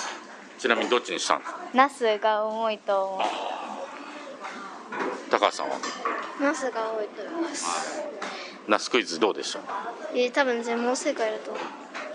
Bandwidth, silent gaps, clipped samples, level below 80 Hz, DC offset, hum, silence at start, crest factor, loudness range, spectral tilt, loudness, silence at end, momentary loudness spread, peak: 11 kHz; none; under 0.1%; -82 dBFS; under 0.1%; none; 0 s; 24 dB; 4 LU; -2 dB/octave; -27 LUFS; 0 s; 13 LU; -4 dBFS